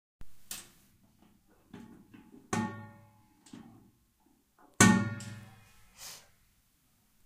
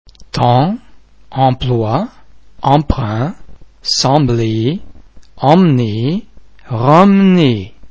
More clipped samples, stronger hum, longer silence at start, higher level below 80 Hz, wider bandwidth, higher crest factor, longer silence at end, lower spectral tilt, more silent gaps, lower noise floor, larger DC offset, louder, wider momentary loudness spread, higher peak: second, under 0.1% vs 0.4%; neither; about the same, 0.2 s vs 0.1 s; second, -62 dBFS vs -34 dBFS; first, 15.5 kHz vs 8 kHz; first, 32 dB vs 14 dB; first, 1.1 s vs 0.05 s; second, -4 dB/octave vs -6.5 dB/octave; neither; first, -70 dBFS vs -41 dBFS; second, under 0.1% vs 1%; second, -29 LUFS vs -13 LUFS; first, 30 LU vs 14 LU; second, -4 dBFS vs 0 dBFS